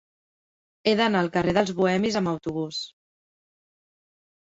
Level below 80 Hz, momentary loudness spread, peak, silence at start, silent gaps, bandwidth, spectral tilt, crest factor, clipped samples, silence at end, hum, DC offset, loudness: -58 dBFS; 9 LU; -6 dBFS; 0.85 s; none; 8 kHz; -5.5 dB/octave; 20 dB; under 0.1%; 1.55 s; none; under 0.1%; -24 LUFS